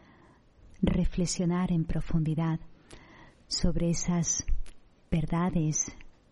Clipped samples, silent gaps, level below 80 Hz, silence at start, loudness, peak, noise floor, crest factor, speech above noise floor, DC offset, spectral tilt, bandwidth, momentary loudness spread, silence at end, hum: under 0.1%; none; -38 dBFS; 0.65 s; -30 LUFS; -10 dBFS; -58 dBFS; 20 dB; 31 dB; under 0.1%; -5 dB/octave; 11 kHz; 6 LU; 0.2 s; none